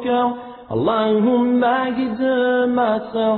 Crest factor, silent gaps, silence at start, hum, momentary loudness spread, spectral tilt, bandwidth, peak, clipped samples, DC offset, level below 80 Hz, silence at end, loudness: 12 dB; none; 0 s; none; 6 LU; -10 dB/octave; 4.5 kHz; -6 dBFS; under 0.1%; under 0.1%; -56 dBFS; 0 s; -18 LUFS